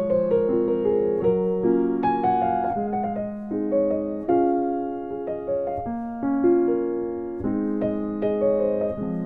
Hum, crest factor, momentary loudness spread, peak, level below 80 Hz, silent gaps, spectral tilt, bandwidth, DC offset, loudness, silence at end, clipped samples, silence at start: none; 14 dB; 8 LU; -10 dBFS; -52 dBFS; none; -11 dB/octave; 4.3 kHz; under 0.1%; -24 LUFS; 0 s; under 0.1%; 0 s